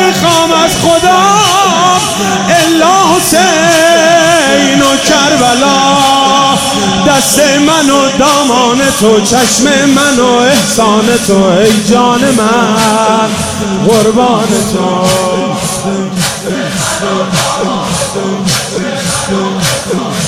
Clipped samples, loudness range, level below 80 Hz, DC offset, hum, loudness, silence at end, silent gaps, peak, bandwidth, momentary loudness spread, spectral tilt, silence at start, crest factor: 0.5%; 6 LU; -38 dBFS; under 0.1%; none; -8 LUFS; 0 s; none; 0 dBFS; 17 kHz; 7 LU; -3.5 dB/octave; 0 s; 8 dB